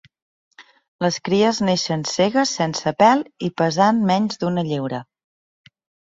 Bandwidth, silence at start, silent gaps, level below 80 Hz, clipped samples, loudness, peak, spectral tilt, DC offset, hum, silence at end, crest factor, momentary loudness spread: 7.8 kHz; 0.6 s; 0.88-0.99 s; -60 dBFS; under 0.1%; -19 LUFS; -2 dBFS; -5 dB/octave; under 0.1%; none; 1.1 s; 18 dB; 8 LU